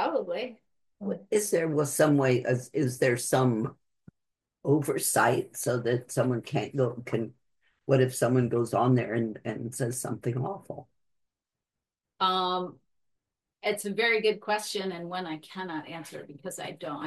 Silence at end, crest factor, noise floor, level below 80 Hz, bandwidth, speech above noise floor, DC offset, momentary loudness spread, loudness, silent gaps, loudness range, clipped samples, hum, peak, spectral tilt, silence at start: 0 s; 20 dB; -89 dBFS; -72 dBFS; 12.5 kHz; 61 dB; under 0.1%; 13 LU; -28 LUFS; none; 6 LU; under 0.1%; none; -10 dBFS; -5 dB/octave; 0 s